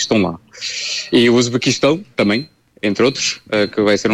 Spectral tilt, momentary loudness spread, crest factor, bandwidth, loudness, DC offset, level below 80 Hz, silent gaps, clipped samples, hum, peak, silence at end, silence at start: -4 dB/octave; 9 LU; 14 dB; 12.5 kHz; -16 LUFS; under 0.1%; -54 dBFS; none; under 0.1%; none; -2 dBFS; 0 s; 0 s